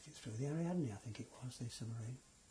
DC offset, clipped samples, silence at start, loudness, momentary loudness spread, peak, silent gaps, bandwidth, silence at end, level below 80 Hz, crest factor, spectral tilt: under 0.1%; under 0.1%; 0 s; -45 LUFS; 11 LU; -30 dBFS; none; 11 kHz; 0 s; -72 dBFS; 14 dB; -6.5 dB/octave